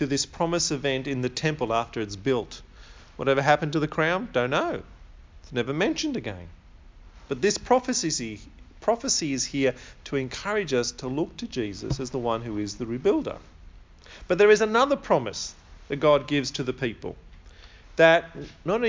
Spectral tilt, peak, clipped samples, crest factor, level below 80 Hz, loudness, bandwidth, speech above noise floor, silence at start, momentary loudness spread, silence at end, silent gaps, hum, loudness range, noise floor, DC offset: -4 dB/octave; -4 dBFS; under 0.1%; 22 dB; -50 dBFS; -25 LUFS; 7.6 kHz; 23 dB; 0 s; 15 LU; 0 s; none; none; 5 LU; -48 dBFS; under 0.1%